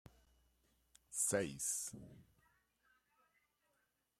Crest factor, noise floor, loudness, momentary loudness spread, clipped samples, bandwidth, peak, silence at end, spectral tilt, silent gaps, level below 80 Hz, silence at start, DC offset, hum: 24 dB; -83 dBFS; -40 LUFS; 12 LU; under 0.1%; 16 kHz; -24 dBFS; 1.95 s; -3 dB/octave; none; -76 dBFS; 1.1 s; under 0.1%; none